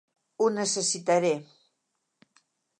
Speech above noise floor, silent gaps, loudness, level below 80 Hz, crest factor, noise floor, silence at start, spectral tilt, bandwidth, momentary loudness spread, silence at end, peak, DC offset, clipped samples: 53 dB; none; -26 LUFS; -82 dBFS; 18 dB; -79 dBFS; 0.4 s; -3 dB/octave; 11 kHz; 4 LU; 1.35 s; -12 dBFS; under 0.1%; under 0.1%